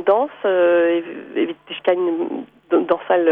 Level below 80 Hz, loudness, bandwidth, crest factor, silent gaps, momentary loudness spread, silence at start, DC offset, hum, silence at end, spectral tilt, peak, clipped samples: -68 dBFS; -19 LUFS; 3.8 kHz; 14 dB; none; 9 LU; 0 s; under 0.1%; none; 0 s; -8 dB/octave; -4 dBFS; under 0.1%